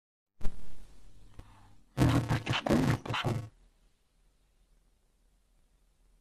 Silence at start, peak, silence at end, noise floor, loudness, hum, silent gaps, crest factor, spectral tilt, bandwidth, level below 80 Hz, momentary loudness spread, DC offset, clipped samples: 0.4 s; -12 dBFS; 2.7 s; -69 dBFS; -30 LUFS; none; none; 20 dB; -6 dB/octave; 14 kHz; -48 dBFS; 19 LU; under 0.1%; under 0.1%